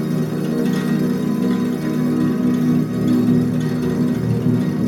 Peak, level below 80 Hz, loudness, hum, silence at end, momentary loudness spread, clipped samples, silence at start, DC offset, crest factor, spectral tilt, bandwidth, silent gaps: -6 dBFS; -48 dBFS; -19 LUFS; none; 0 s; 3 LU; under 0.1%; 0 s; under 0.1%; 12 dB; -8 dB/octave; 16.5 kHz; none